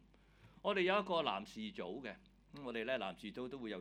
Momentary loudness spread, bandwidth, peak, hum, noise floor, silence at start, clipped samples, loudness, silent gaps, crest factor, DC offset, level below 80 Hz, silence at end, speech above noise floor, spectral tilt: 16 LU; 13 kHz; -20 dBFS; none; -66 dBFS; 0.4 s; under 0.1%; -40 LUFS; none; 22 dB; under 0.1%; -70 dBFS; 0 s; 25 dB; -5.5 dB/octave